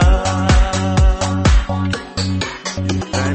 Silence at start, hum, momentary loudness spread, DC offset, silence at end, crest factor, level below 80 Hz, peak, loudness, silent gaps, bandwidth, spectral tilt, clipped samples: 0 s; none; 7 LU; under 0.1%; 0 s; 12 dB; -18 dBFS; -2 dBFS; -17 LUFS; none; 8.8 kHz; -5.5 dB/octave; under 0.1%